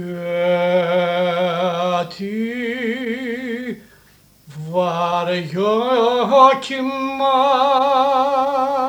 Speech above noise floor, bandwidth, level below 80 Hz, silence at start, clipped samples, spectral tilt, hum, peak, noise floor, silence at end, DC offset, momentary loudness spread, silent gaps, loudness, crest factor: 32 dB; 17 kHz; -62 dBFS; 0 s; under 0.1%; -5.5 dB/octave; 50 Hz at -60 dBFS; 0 dBFS; -51 dBFS; 0 s; under 0.1%; 10 LU; none; -18 LUFS; 18 dB